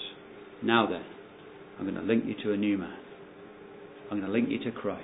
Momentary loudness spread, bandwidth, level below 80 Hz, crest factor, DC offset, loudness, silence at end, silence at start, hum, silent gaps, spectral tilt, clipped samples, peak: 22 LU; 4 kHz; -66 dBFS; 24 dB; under 0.1%; -30 LUFS; 0 s; 0 s; none; none; -9.5 dB/octave; under 0.1%; -6 dBFS